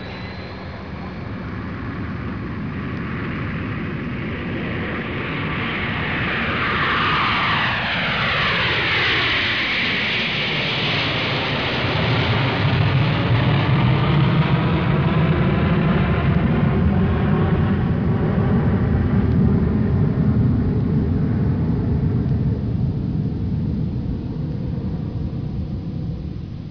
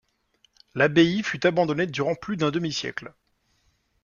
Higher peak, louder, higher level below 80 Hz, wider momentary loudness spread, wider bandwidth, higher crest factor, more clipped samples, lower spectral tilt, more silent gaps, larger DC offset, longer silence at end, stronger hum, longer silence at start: about the same, -4 dBFS vs -6 dBFS; first, -20 LUFS vs -24 LUFS; first, -32 dBFS vs -62 dBFS; about the same, 10 LU vs 12 LU; second, 5.4 kHz vs 7.2 kHz; second, 14 dB vs 20 dB; neither; first, -7.5 dB/octave vs -5.5 dB/octave; neither; first, 0.4% vs under 0.1%; second, 0 s vs 0.95 s; neither; second, 0 s vs 0.75 s